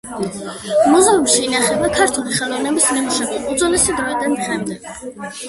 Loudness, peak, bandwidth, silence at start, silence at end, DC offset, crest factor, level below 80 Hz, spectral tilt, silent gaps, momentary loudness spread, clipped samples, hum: -16 LUFS; 0 dBFS; 12 kHz; 0.05 s; 0 s; under 0.1%; 16 dB; -46 dBFS; -2.5 dB/octave; none; 15 LU; under 0.1%; none